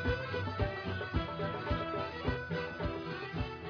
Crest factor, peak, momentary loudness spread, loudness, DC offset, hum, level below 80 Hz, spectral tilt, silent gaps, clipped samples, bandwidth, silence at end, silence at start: 16 dB; -20 dBFS; 3 LU; -37 LUFS; under 0.1%; none; -46 dBFS; -4.5 dB/octave; none; under 0.1%; 5.4 kHz; 0 s; 0 s